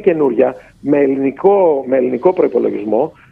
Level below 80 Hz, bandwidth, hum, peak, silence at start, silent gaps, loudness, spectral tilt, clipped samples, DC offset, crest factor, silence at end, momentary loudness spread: -56 dBFS; 3.7 kHz; none; 0 dBFS; 0 s; none; -14 LUFS; -9.5 dB/octave; under 0.1%; under 0.1%; 14 dB; 0.2 s; 5 LU